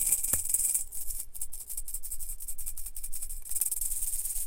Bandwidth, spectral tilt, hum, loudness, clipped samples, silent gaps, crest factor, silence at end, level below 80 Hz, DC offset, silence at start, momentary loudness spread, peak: 17 kHz; 0 dB/octave; none; -31 LUFS; under 0.1%; none; 22 dB; 0 s; -42 dBFS; under 0.1%; 0 s; 12 LU; -8 dBFS